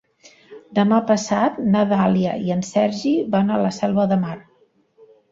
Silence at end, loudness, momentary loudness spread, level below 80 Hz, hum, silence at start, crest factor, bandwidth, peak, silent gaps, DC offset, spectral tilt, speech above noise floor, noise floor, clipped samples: 0.9 s; -19 LUFS; 5 LU; -58 dBFS; none; 0.5 s; 16 dB; 7.8 kHz; -4 dBFS; none; under 0.1%; -6.5 dB/octave; 41 dB; -59 dBFS; under 0.1%